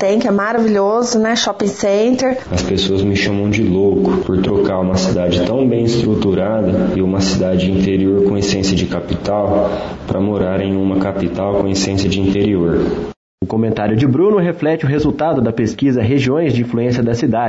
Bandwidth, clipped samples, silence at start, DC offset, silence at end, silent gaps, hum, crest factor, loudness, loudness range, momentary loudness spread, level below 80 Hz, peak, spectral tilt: 8 kHz; under 0.1%; 0 s; under 0.1%; 0 s; 13.16-13.38 s; none; 10 dB; -15 LUFS; 2 LU; 4 LU; -38 dBFS; -4 dBFS; -6 dB/octave